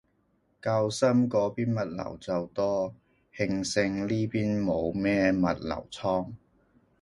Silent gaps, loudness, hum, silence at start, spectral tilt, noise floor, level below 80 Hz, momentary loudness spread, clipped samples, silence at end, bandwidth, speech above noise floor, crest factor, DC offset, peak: none; -28 LUFS; none; 0.65 s; -6 dB/octave; -70 dBFS; -56 dBFS; 9 LU; under 0.1%; 0.65 s; 11.5 kHz; 43 dB; 18 dB; under 0.1%; -10 dBFS